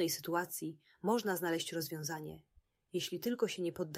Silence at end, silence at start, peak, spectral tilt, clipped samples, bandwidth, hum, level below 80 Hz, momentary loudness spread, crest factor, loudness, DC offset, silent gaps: 0 s; 0 s; -20 dBFS; -4 dB/octave; under 0.1%; 16 kHz; none; -76 dBFS; 10 LU; 18 dB; -38 LUFS; under 0.1%; none